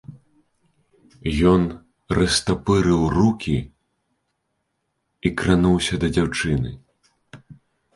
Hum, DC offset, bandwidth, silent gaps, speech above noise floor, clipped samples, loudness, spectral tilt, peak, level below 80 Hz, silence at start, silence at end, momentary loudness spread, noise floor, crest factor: none; under 0.1%; 11.5 kHz; none; 55 dB; under 0.1%; -20 LUFS; -5.5 dB/octave; -2 dBFS; -38 dBFS; 0.1 s; 0.4 s; 10 LU; -74 dBFS; 20 dB